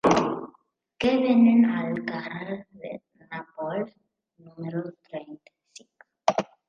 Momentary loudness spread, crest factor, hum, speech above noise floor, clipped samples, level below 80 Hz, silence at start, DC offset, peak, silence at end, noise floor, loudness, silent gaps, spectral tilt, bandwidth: 21 LU; 22 dB; none; 44 dB; under 0.1%; -64 dBFS; 0.05 s; under 0.1%; -4 dBFS; 0.25 s; -67 dBFS; -25 LUFS; none; -6 dB/octave; 7.4 kHz